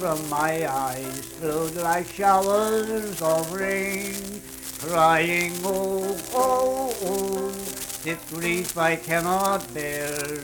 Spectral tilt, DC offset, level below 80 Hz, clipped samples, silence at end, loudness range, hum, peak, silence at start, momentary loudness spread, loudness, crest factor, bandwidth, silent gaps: -3.5 dB/octave; under 0.1%; -54 dBFS; under 0.1%; 0 s; 2 LU; none; -6 dBFS; 0 s; 10 LU; -24 LUFS; 18 dB; 19 kHz; none